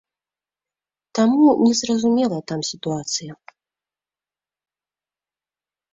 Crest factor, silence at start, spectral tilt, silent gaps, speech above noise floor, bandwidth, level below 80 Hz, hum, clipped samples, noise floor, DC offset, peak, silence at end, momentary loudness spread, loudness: 18 dB; 1.15 s; -4.5 dB/octave; none; over 72 dB; 7.8 kHz; -64 dBFS; 50 Hz at -55 dBFS; under 0.1%; under -90 dBFS; under 0.1%; -6 dBFS; 2.6 s; 12 LU; -19 LUFS